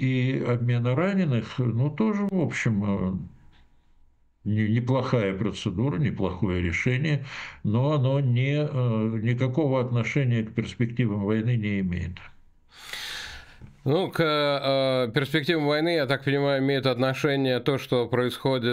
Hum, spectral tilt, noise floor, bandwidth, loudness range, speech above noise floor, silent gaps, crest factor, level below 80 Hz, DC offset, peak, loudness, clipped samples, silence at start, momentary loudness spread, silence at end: none; -7 dB/octave; -58 dBFS; 14.5 kHz; 4 LU; 34 dB; none; 18 dB; -52 dBFS; under 0.1%; -8 dBFS; -25 LUFS; under 0.1%; 0 s; 9 LU; 0 s